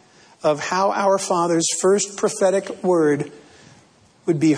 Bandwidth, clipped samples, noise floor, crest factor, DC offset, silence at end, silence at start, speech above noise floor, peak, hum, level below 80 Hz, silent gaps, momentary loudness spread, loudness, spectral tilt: 11 kHz; under 0.1%; -53 dBFS; 14 dB; under 0.1%; 0 s; 0.45 s; 34 dB; -6 dBFS; none; -68 dBFS; none; 6 LU; -20 LUFS; -4.5 dB/octave